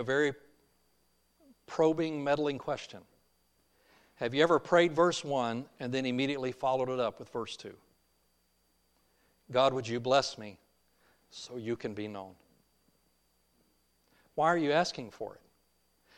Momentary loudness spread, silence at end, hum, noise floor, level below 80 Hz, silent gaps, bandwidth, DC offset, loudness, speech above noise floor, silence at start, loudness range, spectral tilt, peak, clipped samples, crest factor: 18 LU; 0.85 s; none; -73 dBFS; -72 dBFS; none; 11.5 kHz; under 0.1%; -31 LUFS; 42 dB; 0 s; 8 LU; -5 dB/octave; -10 dBFS; under 0.1%; 22 dB